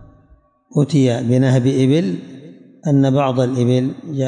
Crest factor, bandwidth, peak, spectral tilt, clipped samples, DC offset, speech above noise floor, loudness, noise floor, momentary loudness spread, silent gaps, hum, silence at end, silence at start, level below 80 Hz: 12 dB; 10 kHz; -4 dBFS; -7.5 dB/octave; under 0.1%; under 0.1%; 37 dB; -16 LUFS; -52 dBFS; 9 LU; none; none; 0 s; 0.75 s; -58 dBFS